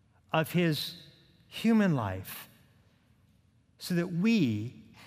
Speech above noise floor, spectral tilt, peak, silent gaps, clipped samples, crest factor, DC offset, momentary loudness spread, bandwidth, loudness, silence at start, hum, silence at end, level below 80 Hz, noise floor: 37 dB; -6.5 dB/octave; -12 dBFS; none; under 0.1%; 20 dB; under 0.1%; 17 LU; 16 kHz; -30 LUFS; 0.35 s; none; 0 s; -72 dBFS; -66 dBFS